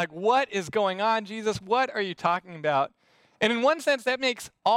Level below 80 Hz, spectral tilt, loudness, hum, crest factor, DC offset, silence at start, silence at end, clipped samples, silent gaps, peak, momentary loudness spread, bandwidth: -68 dBFS; -4 dB/octave; -26 LUFS; none; 16 dB; under 0.1%; 0 s; 0 s; under 0.1%; none; -10 dBFS; 5 LU; 16 kHz